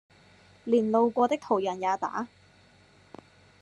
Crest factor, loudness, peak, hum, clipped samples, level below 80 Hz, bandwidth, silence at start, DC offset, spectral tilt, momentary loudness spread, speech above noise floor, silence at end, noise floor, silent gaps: 20 dB; -27 LUFS; -10 dBFS; none; under 0.1%; -74 dBFS; 9.2 kHz; 0.65 s; under 0.1%; -6 dB/octave; 13 LU; 33 dB; 1.35 s; -59 dBFS; none